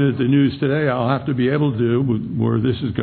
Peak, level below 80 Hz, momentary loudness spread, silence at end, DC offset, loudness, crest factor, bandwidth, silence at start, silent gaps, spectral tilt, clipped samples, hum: -4 dBFS; -48 dBFS; 4 LU; 0 s; under 0.1%; -19 LUFS; 14 dB; 4.5 kHz; 0 s; none; -12 dB/octave; under 0.1%; none